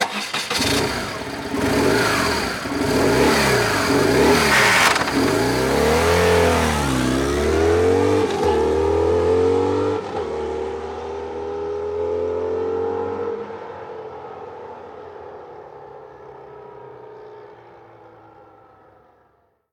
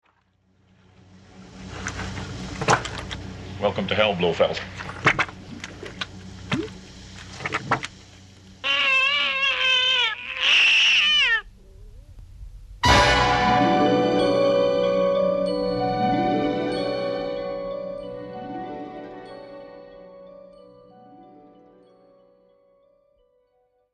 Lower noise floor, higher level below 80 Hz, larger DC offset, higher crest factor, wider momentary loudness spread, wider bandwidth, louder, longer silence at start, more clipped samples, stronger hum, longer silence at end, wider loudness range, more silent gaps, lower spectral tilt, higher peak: second, -62 dBFS vs -67 dBFS; first, -38 dBFS vs -44 dBFS; neither; second, 16 dB vs 22 dB; about the same, 23 LU vs 21 LU; first, 19 kHz vs 12.5 kHz; about the same, -19 LUFS vs -21 LUFS; second, 0 s vs 1.35 s; neither; neither; second, 1.95 s vs 2.7 s; first, 20 LU vs 14 LU; neither; about the same, -4 dB/octave vs -4 dB/octave; about the same, -4 dBFS vs -2 dBFS